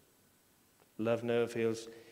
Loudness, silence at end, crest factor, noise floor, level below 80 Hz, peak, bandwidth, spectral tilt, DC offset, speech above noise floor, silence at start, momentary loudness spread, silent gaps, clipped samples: -35 LUFS; 0 s; 18 dB; -69 dBFS; -80 dBFS; -20 dBFS; 16 kHz; -6 dB/octave; under 0.1%; 34 dB; 1 s; 11 LU; none; under 0.1%